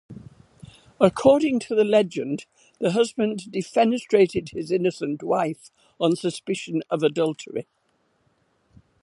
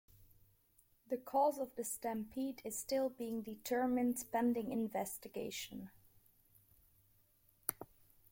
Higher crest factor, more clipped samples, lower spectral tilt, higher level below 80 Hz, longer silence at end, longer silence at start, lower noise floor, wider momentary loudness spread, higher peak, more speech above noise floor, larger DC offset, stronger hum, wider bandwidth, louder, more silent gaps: about the same, 22 dB vs 26 dB; neither; first, -6 dB/octave vs -4 dB/octave; first, -62 dBFS vs -74 dBFS; first, 1.4 s vs 0.45 s; about the same, 0.1 s vs 0.2 s; second, -68 dBFS vs -73 dBFS; about the same, 11 LU vs 10 LU; first, -2 dBFS vs -14 dBFS; first, 46 dB vs 34 dB; neither; neither; second, 11.5 kHz vs 16.5 kHz; first, -23 LUFS vs -40 LUFS; neither